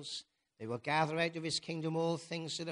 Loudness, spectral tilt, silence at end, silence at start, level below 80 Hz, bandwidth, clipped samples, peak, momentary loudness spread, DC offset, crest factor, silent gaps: -36 LUFS; -4.5 dB/octave; 0 s; 0 s; -76 dBFS; 10.5 kHz; under 0.1%; -18 dBFS; 11 LU; under 0.1%; 20 dB; none